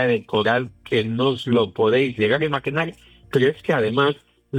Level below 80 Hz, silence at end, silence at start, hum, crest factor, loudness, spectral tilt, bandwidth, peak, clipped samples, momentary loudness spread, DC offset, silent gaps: -56 dBFS; 0 s; 0 s; none; 16 dB; -21 LUFS; -7 dB/octave; 12 kHz; -6 dBFS; under 0.1%; 6 LU; under 0.1%; none